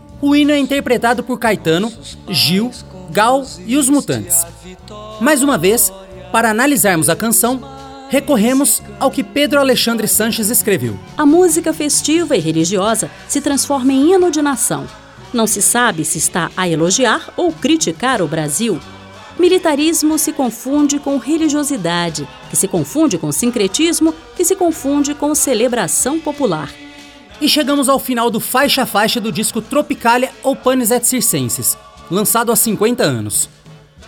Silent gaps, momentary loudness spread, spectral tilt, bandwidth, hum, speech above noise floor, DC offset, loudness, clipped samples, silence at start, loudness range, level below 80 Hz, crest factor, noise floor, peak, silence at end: none; 7 LU; -3 dB/octave; over 20 kHz; none; 26 dB; under 0.1%; -14 LUFS; under 0.1%; 0.1 s; 2 LU; -46 dBFS; 14 dB; -40 dBFS; -2 dBFS; 0 s